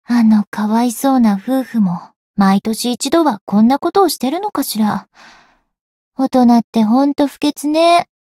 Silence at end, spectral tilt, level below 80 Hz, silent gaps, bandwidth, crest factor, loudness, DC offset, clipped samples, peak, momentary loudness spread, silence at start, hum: 0.15 s; -5.5 dB/octave; -56 dBFS; 0.47-0.52 s, 2.16-2.34 s, 3.41-3.47 s, 5.81-6.12 s, 6.64-6.73 s; 16 kHz; 14 dB; -14 LUFS; under 0.1%; under 0.1%; -2 dBFS; 7 LU; 0.1 s; none